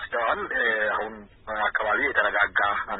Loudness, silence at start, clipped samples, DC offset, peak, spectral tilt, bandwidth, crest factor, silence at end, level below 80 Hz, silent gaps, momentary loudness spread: -24 LUFS; 0 s; under 0.1%; under 0.1%; -8 dBFS; -7.5 dB/octave; 4.1 kHz; 18 dB; 0 s; -54 dBFS; none; 10 LU